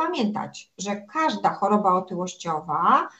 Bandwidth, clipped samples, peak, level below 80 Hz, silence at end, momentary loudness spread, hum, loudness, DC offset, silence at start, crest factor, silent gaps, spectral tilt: 8.4 kHz; under 0.1%; -6 dBFS; -70 dBFS; 0.1 s; 11 LU; none; -24 LUFS; under 0.1%; 0 s; 18 dB; none; -5 dB/octave